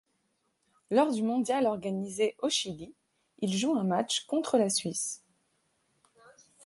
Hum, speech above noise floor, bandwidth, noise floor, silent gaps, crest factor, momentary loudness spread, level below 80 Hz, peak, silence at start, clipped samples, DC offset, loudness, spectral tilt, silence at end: none; 47 dB; 12 kHz; -76 dBFS; none; 20 dB; 9 LU; -74 dBFS; -12 dBFS; 0.9 s; under 0.1%; under 0.1%; -30 LUFS; -4 dB/octave; 1.5 s